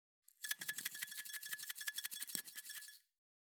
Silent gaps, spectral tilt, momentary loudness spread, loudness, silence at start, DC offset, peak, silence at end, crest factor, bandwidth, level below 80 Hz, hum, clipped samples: none; 2 dB/octave; 8 LU; -45 LUFS; 0.4 s; under 0.1%; -18 dBFS; 0.4 s; 32 dB; over 20 kHz; under -90 dBFS; none; under 0.1%